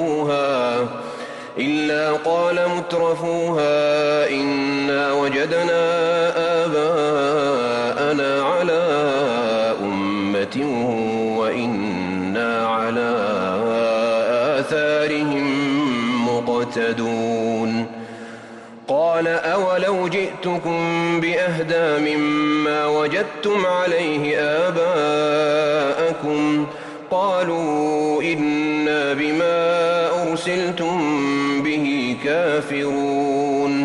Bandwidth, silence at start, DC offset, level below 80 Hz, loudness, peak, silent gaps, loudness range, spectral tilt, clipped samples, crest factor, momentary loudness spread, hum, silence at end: 11.5 kHz; 0 s; under 0.1%; -62 dBFS; -20 LUFS; -8 dBFS; none; 3 LU; -5.5 dB/octave; under 0.1%; 10 dB; 4 LU; none; 0 s